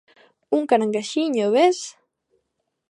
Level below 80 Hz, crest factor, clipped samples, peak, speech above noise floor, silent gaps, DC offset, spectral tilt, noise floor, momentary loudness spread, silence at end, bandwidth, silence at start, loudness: -78 dBFS; 18 dB; under 0.1%; -4 dBFS; 56 dB; none; under 0.1%; -4 dB/octave; -76 dBFS; 9 LU; 1 s; 11 kHz; 0.5 s; -21 LUFS